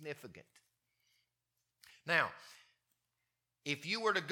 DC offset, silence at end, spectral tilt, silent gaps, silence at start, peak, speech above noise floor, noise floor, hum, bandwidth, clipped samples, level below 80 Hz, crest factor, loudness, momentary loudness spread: under 0.1%; 0 s; -3.5 dB/octave; none; 0 s; -14 dBFS; 49 dB; -87 dBFS; none; 18 kHz; under 0.1%; -88 dBFS; 26 dB; -36 LUFS; 22 LU